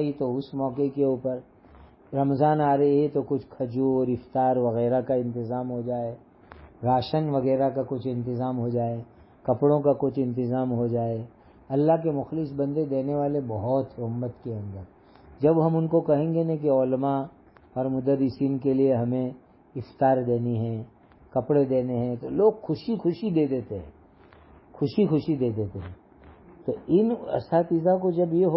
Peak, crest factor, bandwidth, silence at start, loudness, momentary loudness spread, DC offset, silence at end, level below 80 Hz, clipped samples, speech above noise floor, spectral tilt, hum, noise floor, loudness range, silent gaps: -8 dBFS; 16 dB; 5.8 kHz; 0 s; -26 LUFS; 11 LU; under 0.1%; 0 s; -56 dBFS; under 0.1%; 29 dB; -12.5 dB/octave; none; -53 dBFS; 3 LU; none